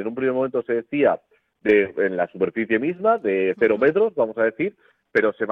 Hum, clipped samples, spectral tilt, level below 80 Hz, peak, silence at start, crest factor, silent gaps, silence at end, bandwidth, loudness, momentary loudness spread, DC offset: none; under 0.1%; -8.5 dB/octave; -62 dBFS; -6 dBFS; 0 s; 16 dB; none; 0 s; 5 kHz; -21 LUFS; 6 LU; under 0.1%